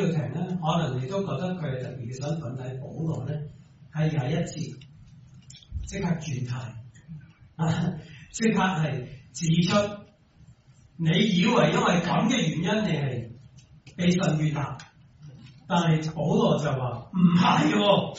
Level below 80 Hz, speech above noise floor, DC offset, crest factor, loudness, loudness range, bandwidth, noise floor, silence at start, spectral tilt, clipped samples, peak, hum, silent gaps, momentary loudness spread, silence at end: -52 dBFS; 30 dB; under 0.1%; 18 dB; -26 LUFS; 8 LU; 8 kHz; -55 dBFS; 0 s; -5.5 dB/octave; under 0.1%; -8 dBFS; none; none; 17 LU; 0 s